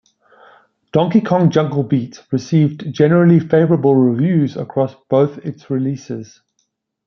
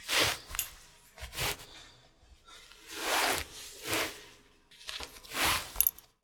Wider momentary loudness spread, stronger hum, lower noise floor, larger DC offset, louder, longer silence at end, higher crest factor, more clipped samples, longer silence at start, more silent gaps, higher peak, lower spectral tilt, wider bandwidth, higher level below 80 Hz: second, 11 LU vs 21 LU; neither; first, -69 dBFS vs -60 dBFS; neither; first, -16 LUFS vs -32 LUFS; first, 0.8 s vs 0.3 s; second, 14 dB vs 32 dB; neither; first, 0.95 s vs 0 s; neither; first, 0 dBFS vs -4 dBFS; first, -8.5 dB/octave vs -1 dB/octave; second, 6.6 kHz vs over 20 kHz; about the same, -58 dBFS vs -54 dBFS